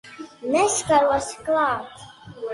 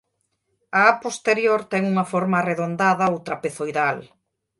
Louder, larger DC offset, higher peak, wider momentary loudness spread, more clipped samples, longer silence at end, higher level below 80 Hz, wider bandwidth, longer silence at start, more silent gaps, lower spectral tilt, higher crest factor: about the same, -21 LUFS vs -21 LUFS; neither; second, -6 dBFS vs -2 dBFS; first, 22 LU vs 9 LU; neither; second, 0 s vs 0.55 s; first, -54 dBFS vs -66 dBFS; about the same, 11.5 kHz vs 11.5 kHz; second, 0.05 s vs 0.75 s; neither; second, -3 dB/octave vs -5.5 dB/octave; second, 16 dB vs 22 dB